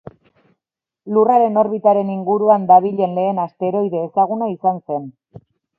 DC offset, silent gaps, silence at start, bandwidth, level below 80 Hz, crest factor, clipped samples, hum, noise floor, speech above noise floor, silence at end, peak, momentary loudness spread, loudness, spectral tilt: under 0.1%; none; 1.05 s; 3.3 kHz; -66 dBFS; 16 dB; under 0.1%; none; -84 dBFS; 68 dB; 0.4 s; 0 dBFS; 9 LU; -17 LUFS; -10.5 dB/octave